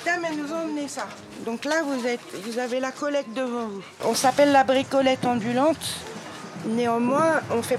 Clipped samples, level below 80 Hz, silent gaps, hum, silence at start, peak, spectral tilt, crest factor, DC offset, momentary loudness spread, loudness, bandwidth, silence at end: under 0.1%; -68 dBFS; none; none; 0 s; -6 dBFS; -4 dB/octave; 18 dB; under 0.1%; 14 LU; -24 LUFS; 15.5 kHz; 0 s